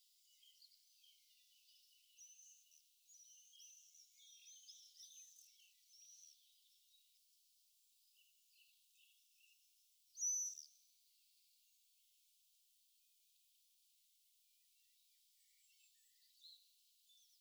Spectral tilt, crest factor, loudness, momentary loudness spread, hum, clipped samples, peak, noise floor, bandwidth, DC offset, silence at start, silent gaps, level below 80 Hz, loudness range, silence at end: 7 dB/octave; 24 dB; -47 LUFS; 26 LU; none; under 0.1%; -34 dBFS; -77 dBFS; over 20 kHz; under 0.1%; 0 s; none; under -90 dBFS; 21 LU; 0 s